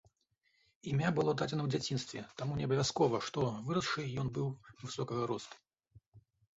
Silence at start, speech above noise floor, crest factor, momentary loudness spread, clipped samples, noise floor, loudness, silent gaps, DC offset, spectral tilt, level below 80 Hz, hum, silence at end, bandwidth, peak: 0.85 s; 43 dB; 18 dB; 11 LU; under 0.1%; -78 dBFS; -36 LUFS; 6.07-6.12 s; under 0.1%; -5.5 dB/octave; -66 dBFS; none; 0.4 s; 8 kHz; -18 dBFS